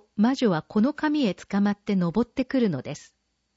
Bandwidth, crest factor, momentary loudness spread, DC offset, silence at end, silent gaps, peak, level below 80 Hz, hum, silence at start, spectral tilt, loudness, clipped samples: 8 kHz; 14 dB; 4 LU; under 0.1%; 0.55 s; none; -10 dBFS; -58 dBFS; none; 0.15 s; -7 dB/octave; -25 LUFS; under 0.1%